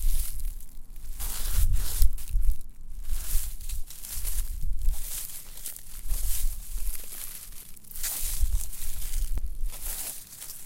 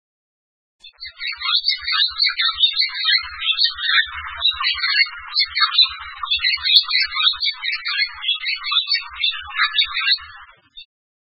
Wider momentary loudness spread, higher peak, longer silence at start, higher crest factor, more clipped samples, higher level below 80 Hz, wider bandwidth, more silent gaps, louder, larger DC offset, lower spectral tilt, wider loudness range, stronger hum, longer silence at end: first, 11 LU vs 7 LU; second, -4 dBFS vs 0 dBFS; second, 0 s vs 0.85 s; about the same, 22 dB vs 20 dB; neither; first, -28 dBFS vs -52 dBFS; first, 17 kHz vs 11 kHz; neither; second, -34 LUFS vs -17 LUFS; second, under 0.1% vs 0.1%; first, -2 dB/octave vs 1 dB/octave; about the same, 3 LU vs 3 LU; neither; second, 0 s vs 0.5 s